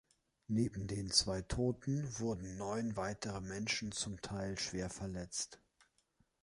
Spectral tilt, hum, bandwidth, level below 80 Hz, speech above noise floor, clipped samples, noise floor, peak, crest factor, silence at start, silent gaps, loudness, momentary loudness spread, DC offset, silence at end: -4 dB/octave; none; 11.5 kHz; -56 dBFS; 38 dB; under 0.1%; -77 dBFS; -16 dBFS; 26 dB; 0.5 s; none; -39 LUFS; 10 LU; under 0.1%; 0.85 s